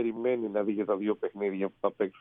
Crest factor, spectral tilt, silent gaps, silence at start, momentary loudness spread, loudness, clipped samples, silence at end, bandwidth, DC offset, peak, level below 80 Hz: 18 dB; -10 dB/octave; none; 0 s; 3 LU; -31 LUFS; under 0.1%; 0 s; 3.8 kHz; under 0.1%; -12 dBFS; -76 dBFS